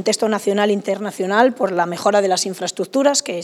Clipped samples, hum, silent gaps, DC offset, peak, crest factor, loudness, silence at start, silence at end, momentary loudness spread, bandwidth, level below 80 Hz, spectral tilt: under 0.1%; none; none; under 0.1%; 0 dBFS; 18 dB; -18 LUFS; 0 s; 0 s; 7 LU; 15.5 kHz; -78 dBFS; -3.5 dB/octave